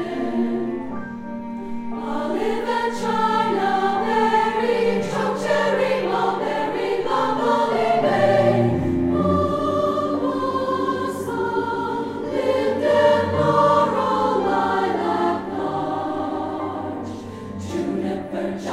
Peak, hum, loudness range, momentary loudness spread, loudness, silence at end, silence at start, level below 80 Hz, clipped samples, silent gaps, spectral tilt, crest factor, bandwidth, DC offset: -4 dBFS; none; 5 LU; 11 LU; -21 LUFS; 0 s; 0 s; -50 dBFS; under 0.1%; none; -6.5 dB/octave; 16 dB; 14.5 kHz; under 0.1%